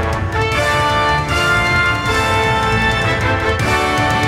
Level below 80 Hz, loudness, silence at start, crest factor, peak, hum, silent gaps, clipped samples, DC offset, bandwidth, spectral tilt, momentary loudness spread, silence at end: -28 dBFS; -15 LUFS; 0 s; 12 dB; -2 dBFS; none; none; under 0.1%; under 0.1%; 16 kHz; -4.5 dB/octave; 2 LU; 0 s